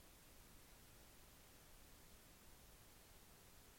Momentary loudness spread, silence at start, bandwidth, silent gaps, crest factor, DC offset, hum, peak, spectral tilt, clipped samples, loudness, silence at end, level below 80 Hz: 0 LU; 0 s; 16.5 kHz; none; 14 dB; under 0.1%; none; -50 dBFS; -3 dB/octave; under 0.1%; -65 LUFS; 0 s; -70 dBFS